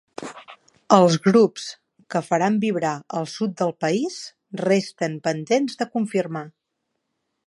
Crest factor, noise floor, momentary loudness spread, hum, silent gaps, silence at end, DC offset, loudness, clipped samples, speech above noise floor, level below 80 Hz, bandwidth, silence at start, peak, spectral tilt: 22 dB; -78 dBFS; 19 LU; none; none; 0.95 s; under 0.1%; -22 LUFS; under 0.1%; 56 dB; -72 dBFS; 11.5 kHz; 0.2 s; 0 dBFS; -5.5 dB/octave